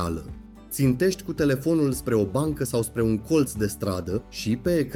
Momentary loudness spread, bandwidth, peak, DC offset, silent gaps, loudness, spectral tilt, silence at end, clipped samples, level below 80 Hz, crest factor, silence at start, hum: 8 LU; 17.5 kHz; -10 dBFS; under 0.1%; none; -25 LUFS; -6 dB/octave; 0 s; under 0.1%; -44 dBFS; 16 dB; 0 s; none